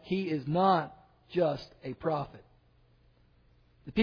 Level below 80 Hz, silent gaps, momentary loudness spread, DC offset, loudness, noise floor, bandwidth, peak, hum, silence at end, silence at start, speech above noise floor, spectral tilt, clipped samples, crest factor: -64 dBFS; none; 17 LU; under 0.1%; -31 LUFS; -64 dBFS; 5.4 kHz; -14 dBFS; none; 0 s; 0.05 s; 34 dB; -8.5 dB/octave; under 0.1%; 20 dB